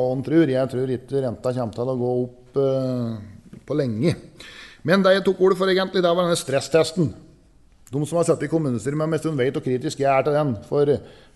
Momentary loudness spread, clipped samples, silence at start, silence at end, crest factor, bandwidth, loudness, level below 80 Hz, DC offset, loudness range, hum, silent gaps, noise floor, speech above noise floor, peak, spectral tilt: 9 LU; under 0.1%; 0 s; 0.25 s; 18 dB; 12 kHz; -22 LUFS; -56 dBFS; under 0.1%; 5 LU; none; none; -53 dBFS; 31 dB; -4 dBFS; -6 dB/octave